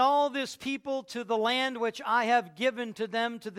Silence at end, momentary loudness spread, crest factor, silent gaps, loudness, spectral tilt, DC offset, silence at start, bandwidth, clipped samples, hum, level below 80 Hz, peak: 0 s; 9 LU; 18 dB; none; -29 LUFS; -3 dB/octave; under 0.1%; 0 s; 16 kHz; under 0.1%; none; -76 dBFS; -12 dBFS